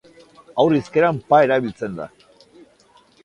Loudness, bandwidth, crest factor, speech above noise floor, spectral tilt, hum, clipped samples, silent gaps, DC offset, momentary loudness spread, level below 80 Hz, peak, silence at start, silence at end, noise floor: -19 LUFS; 10.5 kHz; 20 dB; 37 dB; -7 dB/octave; none; under 0.1%; none; under 0.1%; 15 LU; -58 dBFS; -2 dBFS; 0.55 s; 1.15 s; -54 dBFS